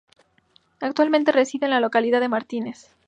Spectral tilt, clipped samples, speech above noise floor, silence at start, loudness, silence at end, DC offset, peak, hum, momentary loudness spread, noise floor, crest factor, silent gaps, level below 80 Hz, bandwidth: -4 dB/octave; under 0.1%; 40 dB; 0.8 s; -21 LUFS; 0.35 s; under 0.1%; -4 dBFS; none; 12 LU; -61 dBFS; 18 dB; none; -74 dBFS; 9 kHz